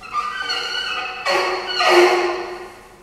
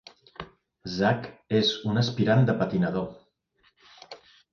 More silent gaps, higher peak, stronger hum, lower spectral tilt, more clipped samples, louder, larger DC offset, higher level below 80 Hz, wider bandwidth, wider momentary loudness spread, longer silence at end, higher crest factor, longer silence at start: neither; first, 0 dBFS vs -8 dBFS; neither; second, -2 dB/octave vs -6.5 dB/octave; neither; first, -18 LUFS vs -25 LUFS; neither; about the same, -56 dBFS vs -58 dBFS; first, 13.5 kHz vs 7 kHz; second, 16 LU vs 24 LU; second, 0.05 s vs 0.35 s; about the same, 20 dB vs 18 dB; second, 0 s vs 0.4 s